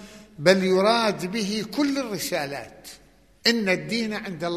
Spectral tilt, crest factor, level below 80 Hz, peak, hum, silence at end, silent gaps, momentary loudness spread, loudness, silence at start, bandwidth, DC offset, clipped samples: -4.5 dB/octave; 22 dB; -60 dBFS; -2 dBFS; none; 0 s; none; 14 LU; -23 LUFS; 0 s; 13.5 kHz; under 0.1%; under 0.1%